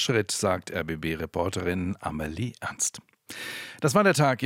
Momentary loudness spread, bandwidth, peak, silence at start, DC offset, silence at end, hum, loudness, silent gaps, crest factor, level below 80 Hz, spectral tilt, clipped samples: 14 LU; 16.5 kHz; -8 dBFS; 0 s; under 0.1%; 0 s; none; -27 LUFS; none; 18 dB; -54 dBFS; -4 dB/octave; under 0.1%